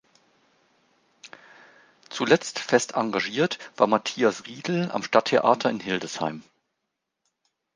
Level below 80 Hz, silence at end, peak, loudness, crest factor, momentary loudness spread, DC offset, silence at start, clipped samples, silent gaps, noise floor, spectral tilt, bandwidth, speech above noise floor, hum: -72 dBFS; 1.35 s; -2 dBFS; -24 LUFS; 24 dB; 10 LU; under 0.1%; 1.25 s; under 0.1%; none; -81 dBFS; -4 dB/octave; 10 kHz; 57 dB; none